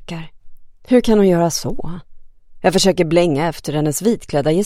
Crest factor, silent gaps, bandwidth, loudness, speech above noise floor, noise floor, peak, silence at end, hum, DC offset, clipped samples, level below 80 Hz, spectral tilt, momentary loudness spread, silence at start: 16 dB; none; 16 kHz; -16 LUFS; 21 dB; -36 dBFS; 0 dBFS; 0 s; none; under 0.1%; under 0.1%; -38 dBFS; -5 dB/octave; 17 LU; 0 s